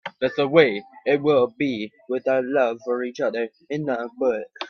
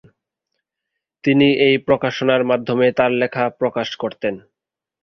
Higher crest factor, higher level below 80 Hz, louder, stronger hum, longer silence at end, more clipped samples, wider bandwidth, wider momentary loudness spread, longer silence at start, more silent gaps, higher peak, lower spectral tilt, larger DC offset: about the same, 22 dB vs 18 dB; second, -68 dBFS vs -58 dBFS; second, -23 LUFS vs -18 LUFS; neither; second, 0 s vs 0.65 s; neither; about the same, 6.6 kHz vs 6.6 kHz; about the same, 11 LU vs 10 LU; second, 0.05 s vs 1.25 s; neither; about the same, 0 dBFS vs -2 dBFS; about the same, -6.5 dB/octave vs -6.5 dB/octave; neither